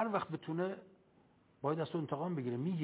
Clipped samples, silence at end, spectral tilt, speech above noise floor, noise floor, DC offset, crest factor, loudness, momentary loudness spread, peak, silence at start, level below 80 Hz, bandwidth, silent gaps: under 0.1%; 0 s; -7 dB/octave; 31 dB; -68 dBFS; under 0.1%; 18 dB; -39 LUFS; 4 LU; -20 dBFS; 0 s; -80 dBFS; 4 kHz; none